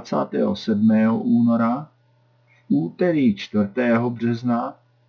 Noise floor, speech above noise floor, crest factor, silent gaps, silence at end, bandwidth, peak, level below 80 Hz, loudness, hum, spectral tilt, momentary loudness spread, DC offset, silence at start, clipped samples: -59 dBFS; 40 dB; 14 dB; none; 0.35 s; 6 kHz; -6 dBFS; -68 dBFS; -21 LUFS; none; -8 dB/octave; 6 LU; under 0.1%; 0 s; under 0.1%